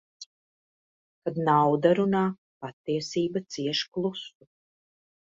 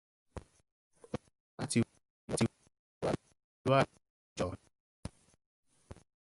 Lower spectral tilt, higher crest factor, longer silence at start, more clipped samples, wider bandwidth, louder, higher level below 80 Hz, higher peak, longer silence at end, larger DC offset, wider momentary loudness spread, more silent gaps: about the same, -6 dB/octave vs -5.5 dB/octave; about the same, 22 dB vs 24 dB; second, 0.2 s vs 0.35 s; neither; second, 7.8 kHz vs 11.5 kHz; first, -26 LUFS vs -36 LUFS; second, -72 dBFS vs -60 dBFS; first, -8 dBFS vs -14 dBFS; first, 0.95 s vs 0.3 s; neither; second, 21 LU vs 24 LU; second, 0.26-1.22 s, 2.38-2.61 s, 2.73-2.84 s, 3.88-3.92 s vs 0.72-0.91 s, 1.40-1.58 s, 2.10-2.28 s, 2.79-3.01 s, 3.44-3.65 s, 4.10-4.36 s, 4.80-5.03 s, 5.46-5.63 s